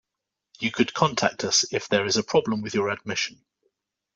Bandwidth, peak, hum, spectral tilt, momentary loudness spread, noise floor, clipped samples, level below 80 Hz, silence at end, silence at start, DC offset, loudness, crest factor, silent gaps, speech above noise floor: 8.2 kHz; -4 dBFS; none; -3 dB/octave; 7 LU; -85 dBFS; under 0.1%; -64 dBFS; 0.8 s; 0.6 s; under 0.1%; -24 LUFS; 22 dB; none; 60 dB